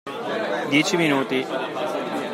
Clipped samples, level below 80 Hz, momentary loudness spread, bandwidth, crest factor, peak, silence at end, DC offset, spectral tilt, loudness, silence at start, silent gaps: under 0.1%; -72 dBFS; 7 LU; 16 kHz; 18 dB; -4 dBFS; 0 s; under 0.1%; -4 dB/octave; -23 LUFS; 0.05 s; none